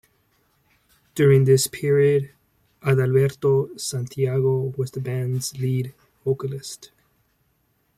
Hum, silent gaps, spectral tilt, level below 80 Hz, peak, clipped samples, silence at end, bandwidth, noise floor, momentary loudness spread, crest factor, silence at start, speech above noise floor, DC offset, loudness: none; none; -6 dB/octave; -60 dBFS; -6 dBFS; under 0.1%; 1.1 s; 15.5 kHz; -67 dBFS; 15 LU; 18 dB; 1.15 s; 47 dB; under 0.1%; -22 LUFS